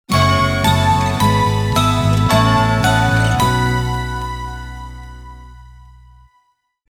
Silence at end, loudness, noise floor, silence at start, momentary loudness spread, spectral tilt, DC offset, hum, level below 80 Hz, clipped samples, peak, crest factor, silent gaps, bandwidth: 1.25 s; -15 LUFS; -63 dBFS; 0.1 s; 18 LU; -5 dB/octave; under 0.1%; none; -30 dBFS; under 0.1%; 0 dBFS; 16 dB; none; 17.5 kHz